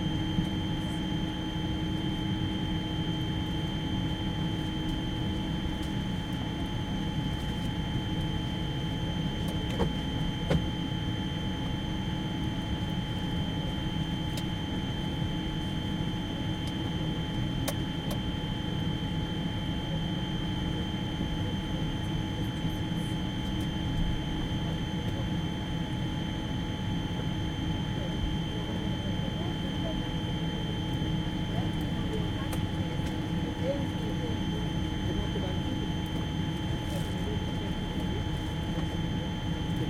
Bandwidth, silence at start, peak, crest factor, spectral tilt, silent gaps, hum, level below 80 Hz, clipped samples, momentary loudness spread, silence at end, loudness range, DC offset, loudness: 16.5 kHz; 0 s; -14 dBFS; 16 dB; -6 dB/octave; none; none; -40 dBFS; under 0.1%; 2 LU; 0 s; 1 LU; under 0.1%; -32 LUFS